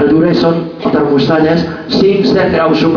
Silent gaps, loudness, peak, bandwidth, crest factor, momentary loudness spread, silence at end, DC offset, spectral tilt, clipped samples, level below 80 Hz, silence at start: none; -11 LUFS; 0 dBFS; 5.4 kHz; 10 dB; 5 LU; 0 s; under 0.1%; -7.5 dB/octave; under 0.1%; -40 dBFS; 0 s